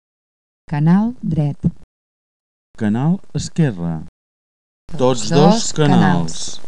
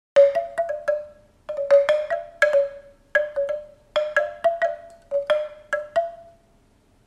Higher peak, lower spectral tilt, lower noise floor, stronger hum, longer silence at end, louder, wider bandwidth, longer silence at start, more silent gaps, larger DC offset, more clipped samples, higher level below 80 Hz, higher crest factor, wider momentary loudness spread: first, 0 dBFS vs -4 dBFS; first, -6 dB/octave vs -2 dB/octave; first, under -90 dBFS vs -59 dBFS; neither; second, 0 s vs 0.85 s; first, -17 LUFS vs -23 LUFS; about the same, 10 kHz vs 10.5 kHz; first, 0.65 s vs 0.15 s; first, 1.84-2.74 s, 4.08-4.88 s vs none; neither; neither; first, -44 dBFS vs -60 dBFS; about the same, 18 dB vs 18 dB; about the same, 12 LU vs 13 LU